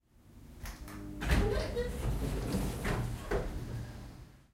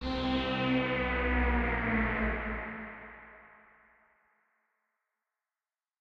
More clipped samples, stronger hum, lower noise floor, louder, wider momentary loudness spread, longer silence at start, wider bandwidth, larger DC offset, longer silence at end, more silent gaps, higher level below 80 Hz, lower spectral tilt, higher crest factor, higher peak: neither; neither; second, -56 dBFS vs under -90 dBFS; second, -36 LUFS vs -31 LUFS; about the same, 17 LU vs 17 LU; first, 0.25 s vs 0 s; first, 16 kHz vs 6.4 kHz; neither; second, 0.15 s vs 2.55 s; neither; about the same, -40 dBFS vs -40 dBFS; second, -6 dB/octave vs -7.5 dB/octave; about the same, 20 dB vs 16 dB; about the same, -16 dBFS vs -18 dBFS